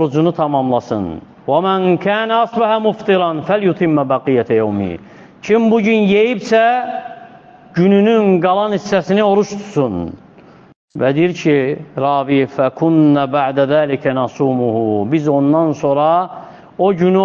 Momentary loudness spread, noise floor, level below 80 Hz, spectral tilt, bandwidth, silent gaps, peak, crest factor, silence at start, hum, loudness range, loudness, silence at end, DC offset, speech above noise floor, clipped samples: 9 LU; -42 dBFS; -54 dBFS; -7.5 dB/octave; 7.4 kHz; 10.76-10.88 s; -2 dBFS; 14 dB; 0 s; none; 2 LU; -15 LUFS; 0 s; under 0.1%; 29 dB; under 0.1%